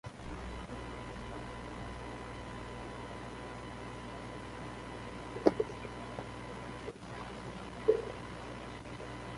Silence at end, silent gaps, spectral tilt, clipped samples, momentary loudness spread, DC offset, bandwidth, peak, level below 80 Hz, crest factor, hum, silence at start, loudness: 0 s; none; -6 dB/octave; under 0.1%; 12 LU; under 0.1%; 11.5 kHz; -8 dBFS; -52 dBFS; 32 dB; 60 Hz at -50 dBFS; 0.05 s; -41 LUFS